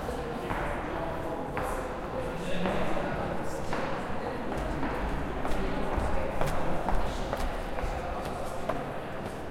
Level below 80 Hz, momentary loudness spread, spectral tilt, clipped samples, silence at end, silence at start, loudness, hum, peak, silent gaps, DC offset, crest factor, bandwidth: -38 dBFS; 4 LU; -6 dB/octave; under 0.1%; 0 s; 0 s; -33 LUFS; none; -12 dBFS; none; under 0.1%; 18 dB; 15.5 kHz